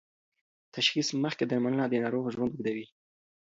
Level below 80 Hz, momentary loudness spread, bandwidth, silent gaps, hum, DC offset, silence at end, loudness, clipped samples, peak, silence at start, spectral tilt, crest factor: -70 dBFS; 8 LU; 7.8 kHz; none; none; under 0.1%; 0.75 s; -30 LUFS; under 0.1%; -10 dBFS; 0.75 s; -4.5 dB/octave; 22 dB